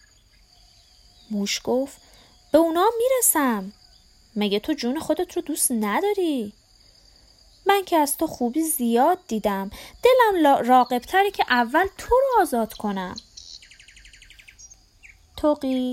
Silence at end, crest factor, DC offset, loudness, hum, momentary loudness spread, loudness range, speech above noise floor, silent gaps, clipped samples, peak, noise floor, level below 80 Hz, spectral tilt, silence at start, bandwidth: 0 s; 18 dB; under 0.1%; -22 LUFS; none; 15 LU; 6 LU; 35 dB; none; under 0.1%; -4 dBFS; -56 dBFS; -52 dBFS; -3 dB/octave; 1.3 s; 16.5 kHz